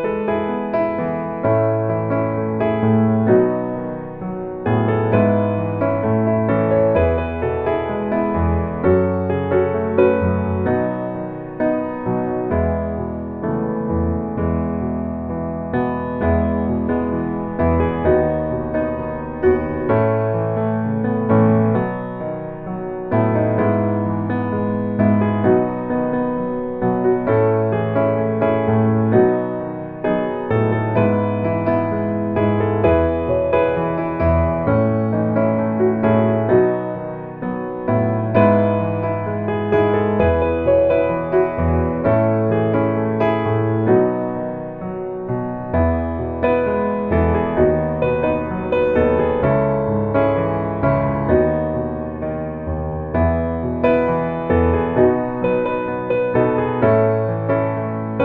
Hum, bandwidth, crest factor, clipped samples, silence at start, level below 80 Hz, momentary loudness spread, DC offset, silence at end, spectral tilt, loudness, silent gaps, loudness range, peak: none; 4.3 kHz; 16 dB; under 0.1%; 0 s; -36 dBFS; 8 LU; under 0.1%; 0 s; -11.5 dB/octave; -19 LUFS; none; 3 LU; -2 dBFS